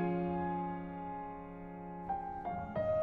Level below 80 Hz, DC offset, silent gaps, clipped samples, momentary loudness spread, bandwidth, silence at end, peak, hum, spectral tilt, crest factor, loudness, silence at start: -58 dBFS; under 0.1%; none; under 0.1%; 11 LU; 4.5 kHz; 0 s; -24 dBFS; none; -10.5 dB/octave; 14 dB; -40 LUFS; 0 s